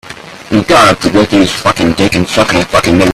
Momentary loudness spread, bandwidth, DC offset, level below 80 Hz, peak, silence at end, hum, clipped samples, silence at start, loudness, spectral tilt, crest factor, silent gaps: 8 LU; 15 kHz; under 0.1%; -34 dBFS; 0 dBFS; 0 s; none; 0.3%; 0.05 s; -9 LUFS; -4.5 dB/octave; 10 dB; none